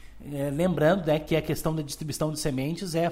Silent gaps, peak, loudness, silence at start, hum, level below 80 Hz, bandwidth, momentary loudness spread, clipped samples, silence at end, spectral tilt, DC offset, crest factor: none; -10 dBFS; -27 LUFS; 0 s; none; -46 dBFS; 16 kHz; 9 LU; under 0.1%; 0 s; -5.5 dB/octave; under 0.1%; 18 dB